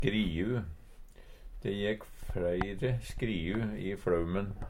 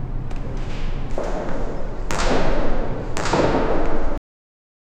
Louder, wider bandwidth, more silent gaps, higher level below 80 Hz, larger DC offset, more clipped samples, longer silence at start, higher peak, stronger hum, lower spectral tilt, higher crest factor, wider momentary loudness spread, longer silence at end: second, -34 LUFS vs -25 LUFS; first, 16.5 kHz vs 8.8 kHz; neither; second, -44 dBFS vs -24 dBFS; neither; neither; about the same, 0 s vs 0 s; second, -14 dBFS vs -2 dBFS; neither; first, -7 dB/octave vs -5.5 dB/octave; about the same, 20 dB vs 16 dB; about the same, 9 LU vs 11 LU; second, 0 s vs 0.8 s